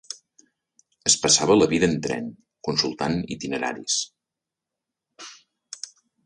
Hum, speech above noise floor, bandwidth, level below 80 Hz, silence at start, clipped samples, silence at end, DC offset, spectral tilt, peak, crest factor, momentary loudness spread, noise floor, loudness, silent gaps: none; 64 dB; 11.5 kHz; -56 dBFS; 0.1 s; under 0.1%; 0.4 s; under 0.1%; -3 dB/octave; -4 dBFS; 22 dB; 24 LU; -87 dBFS; -22 LUFS; none